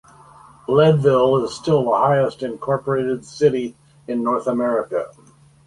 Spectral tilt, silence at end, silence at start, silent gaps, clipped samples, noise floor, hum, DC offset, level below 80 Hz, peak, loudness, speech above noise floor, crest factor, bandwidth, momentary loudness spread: -7 dB/octave; 0.6 s; 0.7 s; none; under 0.1%; -46 dBFS; none; under 0.1%; -56 dBFS; -2 dBFS; -19 LUFS; 28 dB; 18 dB; 11.5 kHz; 12 LU